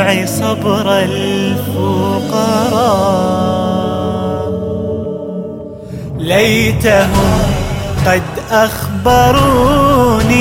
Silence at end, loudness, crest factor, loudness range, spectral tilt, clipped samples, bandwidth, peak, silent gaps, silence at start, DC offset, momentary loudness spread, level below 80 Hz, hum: 0 s; -13 LUFS; 12 dB; 5 LU; -5.5 dB/octave; under 0.1%; 16.5 kHz; 0 dBFS; none; 0 s; under 0.1%; 11 LU; -28 dBFS; none